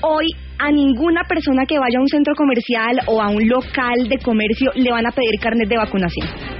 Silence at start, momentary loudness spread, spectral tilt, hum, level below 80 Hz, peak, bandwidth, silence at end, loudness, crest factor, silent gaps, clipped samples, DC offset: 0 s; 3 LU; -3.5 dB/octave; none; -36 dBFS; -6 dBFS; 5.8 kHz; 0 s; -17 LUFS; 12 dB; none; under 0.1%; under 0.1%